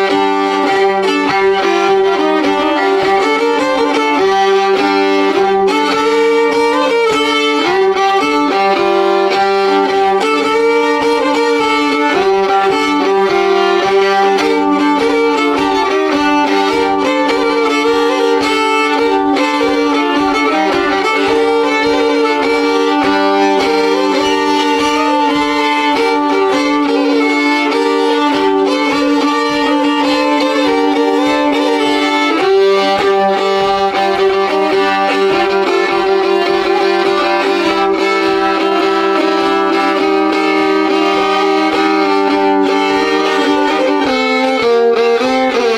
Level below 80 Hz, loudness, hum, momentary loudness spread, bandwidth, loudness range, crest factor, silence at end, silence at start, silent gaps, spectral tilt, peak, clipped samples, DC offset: -48 dBFS; -12 LUFS; none; 1 LU; 13.5 kHz; 1 LU; 8 dB; 0 s; 0 s; none; -3.5 dB/octave; -2 dBFS; under 0.1%; under 0.1%